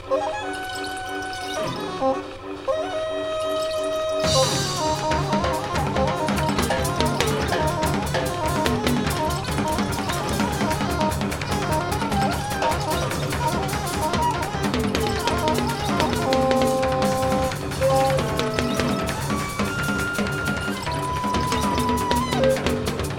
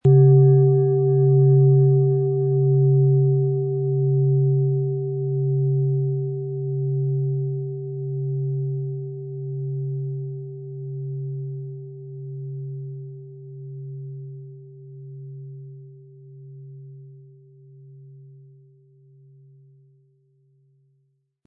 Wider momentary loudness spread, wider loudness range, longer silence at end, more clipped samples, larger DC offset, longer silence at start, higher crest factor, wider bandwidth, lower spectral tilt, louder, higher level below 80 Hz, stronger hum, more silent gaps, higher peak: second, 6 LU vs 24 LU; second, 3 LU vs 22 LU; second, 0 s vs 3.2 s; neither; neither; about the same, 0 s vs 0.05 s; first, 22 dB vs 16 dB; first, 17.5 kHz vs 1.2 kHz; second, -4.5 dB/octave vs -15 dB/octave; about the same, -23 LUFS vs -21 LUFS; first, -38 dBFS vs -66 dBFS; neither; neither; first, -2 dBFS vs -6 dBFS